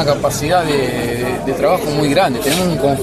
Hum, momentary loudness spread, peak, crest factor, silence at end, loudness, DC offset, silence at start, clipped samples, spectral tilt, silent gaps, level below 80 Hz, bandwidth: none; 5 LU; 0 dBFS; 14 dB; 0 s; -16 LUFS; under 0.1%; 0 s; under 0.1%; -5 dB/octave; none; -38 dBFS; 14.5 kHz